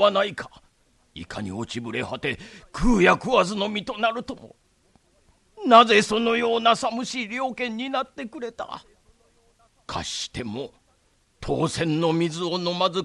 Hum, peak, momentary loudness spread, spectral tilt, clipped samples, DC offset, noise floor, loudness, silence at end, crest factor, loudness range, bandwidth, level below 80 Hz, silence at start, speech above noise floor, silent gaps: none; -2 dBFS; 18 LU; -4.5 dB/octave; under 0.1%; under 0.1%; -64 dBFS; -23 LUFS; 0 s; 22 dB; 11 LU; 12 kHz; -42 dBFS; 0 s; 41 dB; none